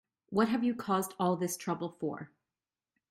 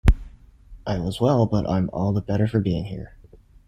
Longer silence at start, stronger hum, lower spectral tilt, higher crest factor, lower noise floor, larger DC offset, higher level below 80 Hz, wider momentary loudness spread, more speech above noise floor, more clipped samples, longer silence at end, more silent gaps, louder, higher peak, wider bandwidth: first, 0.3 s vs 0.05 s; neither; second, -5.5 dB/octave vs -8.5 dB/octave; about the same, 18 dB vs 20 dB; first, under -90 dBFS vs -50 dBFS; neither; second, -72 dBFS vs -30 dBFS; second, 9 LU vs 14 LU; first, over 58 dB vs 27 dB; neither; first, 0.85 s vs 0.6 s; neither; second, -33 LUFS vs -23 LUFS; second, -16 dBFS vs -4 dBFS; first, 16 kHz vs 13 kHz